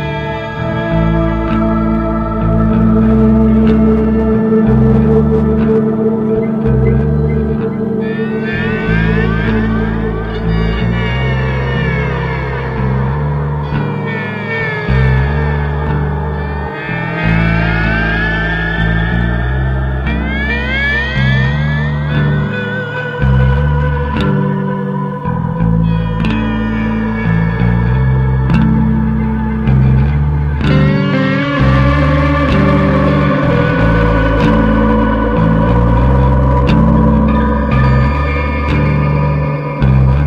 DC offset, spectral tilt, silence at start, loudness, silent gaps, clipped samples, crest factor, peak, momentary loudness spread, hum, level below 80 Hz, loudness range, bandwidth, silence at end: under 0.1%; -9 dB/octave; 0 s; -13 LUFS; none; under 0.1%; 12 dB; 0 dBFS; 7 LU; none; -18 dBFS; 4 LU; 6.6 kHz; 0 s